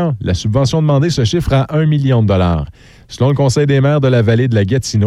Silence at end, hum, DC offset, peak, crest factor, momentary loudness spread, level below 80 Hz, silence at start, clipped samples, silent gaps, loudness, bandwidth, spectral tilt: 0 s; none; under 0.1%; -2 dBFS; 10 dB; 5 LU; -32 dBFS; 0 s; under 0.1%; none; -13 LUFS; 12 kHz; -6.5 dB/octave